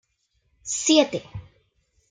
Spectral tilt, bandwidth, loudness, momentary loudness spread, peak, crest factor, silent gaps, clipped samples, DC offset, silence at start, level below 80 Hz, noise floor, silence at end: -2.5 dB/octave; 9.6 kHz; -22 LUFS; 23 LU; -4 dBFS; 22 dB; none; under 0.1%; under 0.1%; 0.65 s; -58 dBFS; -71 dBFS; 0.7 s